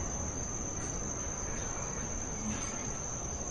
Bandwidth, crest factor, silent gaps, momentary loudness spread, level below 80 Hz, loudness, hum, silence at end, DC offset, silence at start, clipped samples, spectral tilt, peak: 11.5 kHz; 14 dB; none; 1 LU; -44 dBFS; -36 LUFS; none; 0 s; under 0.1%; 0 s; under 0.1%; -3.5 dB/octave; -24 dBFS